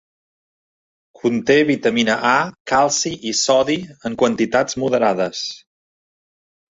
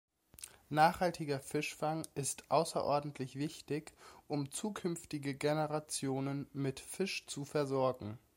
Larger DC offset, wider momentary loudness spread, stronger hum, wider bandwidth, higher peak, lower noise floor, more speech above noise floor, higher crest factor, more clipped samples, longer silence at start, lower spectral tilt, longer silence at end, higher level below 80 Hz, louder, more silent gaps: neither; about the same, 8 LU vs 10 LU; neither; second, 8 kHz vs 16.5 kHz; first, -2 dBFS vs -14 dBFS; first, under -90 dBFS vs -56 dBFS; first, over 72 dB vs 19 dB; about the same, 18 dB vs 22 dB; neither; first, 1.25 s vs 0.4 s; second, -3.5 dB/octave vs -5 dB/octave; first, 1.15 s vs 0.2 s; first, -56 dBFS vs -70 dBFS; first, -18 LUFS vs -37 LUFS; first, 2.60-2.65 s vs none